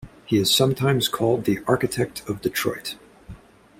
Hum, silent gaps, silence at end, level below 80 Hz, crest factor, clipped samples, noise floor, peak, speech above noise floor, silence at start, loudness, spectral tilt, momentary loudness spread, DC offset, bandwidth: none; none; 0.45 s; -52 dBFS; 18 dB; under 0.1%; -44 dBFS; -4 dBFS; 22 dB; 0 s; -22 LUFS; -4.5 dB/octave; 10 LU; under 0.1%; 16.5 kHz